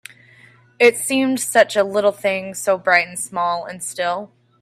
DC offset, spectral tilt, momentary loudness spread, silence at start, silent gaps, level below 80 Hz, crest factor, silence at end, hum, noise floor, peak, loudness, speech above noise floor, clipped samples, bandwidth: under 0.1%; -2.5 dB/octave; 9 LU; 0.8 s; none; -68 dBFS; 20 dB; 0.35 s; none; -50 dBFS; 0 dBFS; -18 LUFS; 31 dB; under 0.1%; 16 kHz